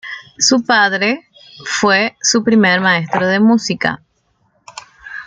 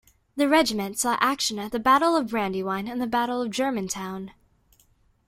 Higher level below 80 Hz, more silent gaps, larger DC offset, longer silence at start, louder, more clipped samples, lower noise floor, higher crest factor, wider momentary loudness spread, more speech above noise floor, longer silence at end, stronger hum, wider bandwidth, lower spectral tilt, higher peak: about the same, -58 dBFS vs -60 dBFS; neither; neither; second, 0.05 s vs 0.35 s; first, -13 LUFS vs -24 LUFS; neither; about the same, -61 dBFS vs -63 dBFS; second, 14 dB vs 20 dB; first, 19 LU vs 11 LU; first, 48 dB vs 38 dB; second, 0 s vs 0.95 s; neither; second, 9.4 kHz vs 16.5 kHz; about the same, -3 dB/octave vs -3.5 dB/octave; first, -2 dBFS vs -6 dBFS